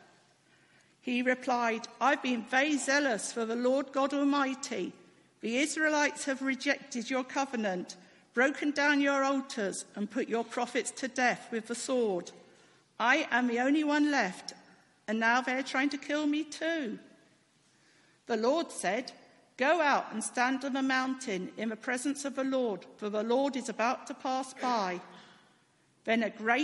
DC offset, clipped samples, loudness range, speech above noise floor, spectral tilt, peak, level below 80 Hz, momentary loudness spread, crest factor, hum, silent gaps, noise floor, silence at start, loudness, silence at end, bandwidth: under 0.1%; under 0.1%; 4 LU; 37 dB; -3 dB/octave; -12 dBFS; -84 dBFS; 9 LU; 20 dB; none; none; -68 dBFS; 1.05 s; -31 LUFS; 0 s; 11.5 kHz